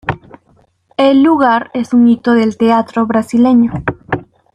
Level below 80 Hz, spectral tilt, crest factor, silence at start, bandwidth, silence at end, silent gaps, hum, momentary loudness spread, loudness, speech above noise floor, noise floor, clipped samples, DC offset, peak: -44 dBFS; -7 dB/octave; 10 dB; 0.05 s; 10.5 kHz; 0.3 s; none; none; 13 LU; -12 LUFS; 42 dB; -53 dBFS; under 0.1%; under 0.1%; -2 dBFS